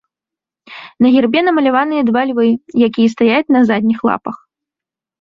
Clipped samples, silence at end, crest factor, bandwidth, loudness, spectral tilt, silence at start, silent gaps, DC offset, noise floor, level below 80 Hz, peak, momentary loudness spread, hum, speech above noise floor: under 0.1%; 0.85 s; 12 dB; 7.2 kHz; -13 LUFS; -6.5 dB/octave; 0.7 s; none; under 0.1%; -87 dBFS; -58 dBFS; -2 dBFS; 11 LU; none; 74 dB